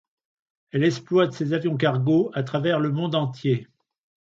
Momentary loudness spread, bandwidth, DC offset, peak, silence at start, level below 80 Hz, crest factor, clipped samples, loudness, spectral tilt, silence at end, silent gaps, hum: 5 LU; 7.6 kHz; under 0.1%; -6 dBFS; 0.75 s; -68 dBFS; 18 dB; under 0.1%; -23 LUFS; -7.5 dB/octave; 0.65 s; none; none